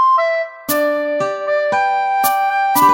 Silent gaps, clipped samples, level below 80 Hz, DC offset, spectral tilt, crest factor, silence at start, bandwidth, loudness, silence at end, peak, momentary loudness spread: none; under 0.1%; -66 dBFS; under 0.1%; -3 dB/octave; 14 dB; 0 s; 17 kHz; -16 LUFS; 0 s; -2 dBFS; 6 LU